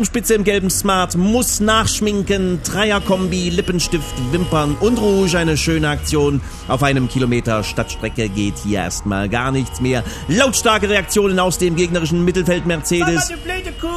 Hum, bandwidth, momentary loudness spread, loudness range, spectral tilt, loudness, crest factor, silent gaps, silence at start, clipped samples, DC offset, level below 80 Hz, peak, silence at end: none; 14 kHz; 6 LU; 3 LU; -4.5 dB/octave; -17 LUFS; 16 dB; none; 0 s; under 0.1%; under 0.1%; -30 dBFS; 0 dBFS; 0 s